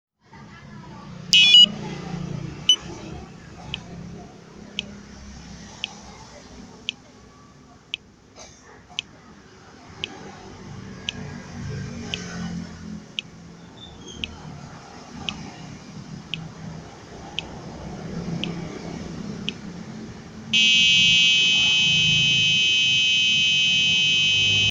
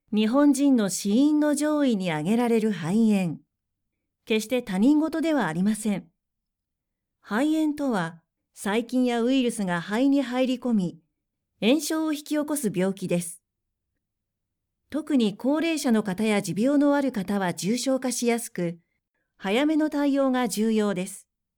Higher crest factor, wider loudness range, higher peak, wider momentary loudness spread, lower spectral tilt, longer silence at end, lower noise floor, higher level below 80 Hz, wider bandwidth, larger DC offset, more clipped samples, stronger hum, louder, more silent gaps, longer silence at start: first, 24 dB vs 16 dB; first, 21 LU vs 4 LU; first, 0 dBFS vs -10 dBFS; first, 26 LU vs 8 LU; second, -1.5 dB/octave vs -5 dB/octave; second, 0 s vs 0.4 s; second, -49 dBFS vs -84 dBFS; first, -50 dBFS vs -66 dBFS; second, 17 kHz vs 19 kHz; neither; neither; neither; first, -16 LUFS vs -24 LUFS; neither; first, 0.35 s vs 0.1 s